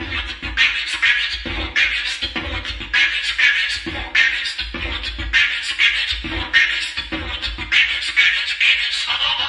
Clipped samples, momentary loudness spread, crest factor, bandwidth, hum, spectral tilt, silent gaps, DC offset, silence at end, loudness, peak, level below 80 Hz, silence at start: under 0.1%; 10 LU; 20 dB; 11.5 kHz; none; -1.5 dB/octave; none; under 0.1%; 0 s; -17 LUFS; 0 dBFS; -36 dBFS; 0 s